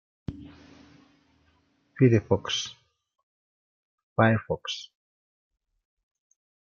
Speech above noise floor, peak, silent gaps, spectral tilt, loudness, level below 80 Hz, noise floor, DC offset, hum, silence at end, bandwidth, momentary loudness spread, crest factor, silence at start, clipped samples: 43 dB; -6 dBFS; 3.23-4.16 s; -6 dB/octave; -26 LUFS; -60 dBFS; -67 dBFS; under 0.1%; none; 1.85 s; 7.2 kHz; 19 LU; 24 dB; 0.3 s; under 0.1%